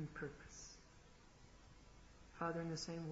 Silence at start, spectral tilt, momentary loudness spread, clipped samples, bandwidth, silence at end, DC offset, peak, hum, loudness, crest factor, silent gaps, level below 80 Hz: 0 s; -5 dB/octave; 21 LU; under 0.1%; 7.6 kHz; 0 s; under 0.1%; -30 dBFS; none; -48 LUFS; 20 dB; none; -66 dBFS